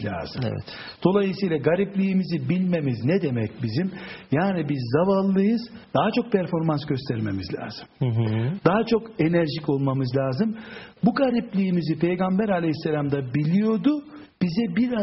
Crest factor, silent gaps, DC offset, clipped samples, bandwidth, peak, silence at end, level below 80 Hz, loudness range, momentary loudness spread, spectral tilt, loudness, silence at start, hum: 20 dB; none; under 0.1%; under 0.1%; 6 kHz; -4 dBFS; 0 s; -56 dBFS; 1 LU; 8 LU; -7 dB/octave; -24 LUFS; 0 s; none